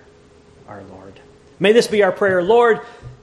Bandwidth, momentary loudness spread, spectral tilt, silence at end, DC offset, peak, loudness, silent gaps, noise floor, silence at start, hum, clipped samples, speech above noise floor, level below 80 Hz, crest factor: 13 kHz; 24 LU; -4.5 dB/octave; 0.1 s; under 0.1%; -2 dBFS; -15 LUFS; none; -48 dBFS; 0.7 s; none; under 0.1%; 31 dB; -54 dBFS; 18 dB